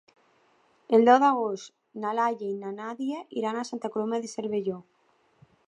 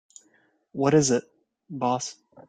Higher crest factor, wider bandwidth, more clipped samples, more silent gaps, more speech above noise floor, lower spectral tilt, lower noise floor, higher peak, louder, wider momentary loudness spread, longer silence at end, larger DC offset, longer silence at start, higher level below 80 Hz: about the same, 22 dB vs 20 dB; about the same, 10 kHz vs 9.6 kHz; neither; neither; about the same, 39 dB vs 42 dB; about the same, -5.5 dB/octave vs -5 dB/octave; about the same, -65 dBFS vs -65 dBFS; about the same, -6 dBFS vs -8 dBFS; about the same, -27 LUFS vs -25 LUFS; about the same, 16 LU vs 18 LU; first, 0.85 s vs 0.35 s; neither; first, 0.9 s vs 0.75 s; second, -80 dBFS vs -64 dBFS